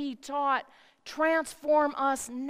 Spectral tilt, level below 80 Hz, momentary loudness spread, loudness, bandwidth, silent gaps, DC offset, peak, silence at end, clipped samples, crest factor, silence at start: -2 dB/octave; -68 dBFS; 9 LU; -28 LUFS; 15.5 kHz; none; under 0.1%; -14 dBFS; 0 s; under 0.1%; 16 dB; 0 s